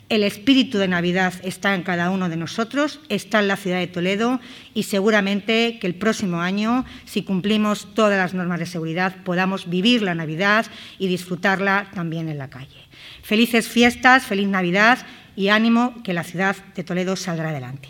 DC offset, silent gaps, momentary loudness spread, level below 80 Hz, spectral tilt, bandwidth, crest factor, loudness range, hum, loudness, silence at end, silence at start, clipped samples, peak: under 0.1%; none; 11 LU; -58 dBFS; -5 dB/octave; 18 kHz; 20 dB; 4 LU; none; -20 LUFS; 0 s; 0.1 s; under 0.1%; 0 dBFS